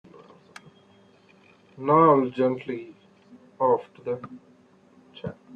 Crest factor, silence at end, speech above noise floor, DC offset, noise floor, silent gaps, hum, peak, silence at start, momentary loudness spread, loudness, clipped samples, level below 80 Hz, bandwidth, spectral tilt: 20 dB; 0.2 s; 34 dB; under 0.1%; -57 dBFS; none; none; -6 dBFS; 1.8 s; 21 LU; -24 LUFS; under 0.1%; -70 dBFS; 8 kHz; -9 dB/octave